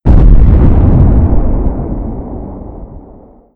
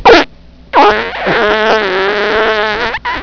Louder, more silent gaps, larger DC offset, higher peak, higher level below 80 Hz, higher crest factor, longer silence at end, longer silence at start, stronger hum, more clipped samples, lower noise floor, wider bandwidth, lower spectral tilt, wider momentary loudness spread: about the same, -10 LUFS vs -11 LUFS; neither; neither; about the same, 0 dBFS vs 0 dBFS; first, -10 dBFS vs -36 dBFS; about the same, 8 dB vs 10 dB; first, 0.55 s vs 0 s; about the same, 0.05 s vs 0 s; neither; about the same, 3% vs 3%; first, -37 dBFS vs -32 dBFS; second, 2.9 kHz vs 5.4 kHz; first, -12 dB/octave vs -4 dB/octave; first, 19 LU vs 6 LU